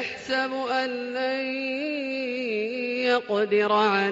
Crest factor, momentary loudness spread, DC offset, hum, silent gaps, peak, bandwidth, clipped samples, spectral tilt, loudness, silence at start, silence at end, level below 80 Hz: 16 dB; 7 LU; under 0.1%; none; none; -10 dBFS; 8 kHz; under 0.1%; -1.5 dB/octave; -25 LUFS; 0 s; 0 s; -70 dBFS